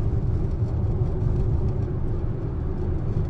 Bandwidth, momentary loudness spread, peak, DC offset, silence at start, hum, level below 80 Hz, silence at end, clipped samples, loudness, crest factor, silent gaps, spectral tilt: 4.7 kHz; 4 LU; -12 dBFS; under 0.1%; 0 s; none; -28 dBFS; 0 s; under 0.1%; -26 LUFS; 12 dB; none; -11 dB/octave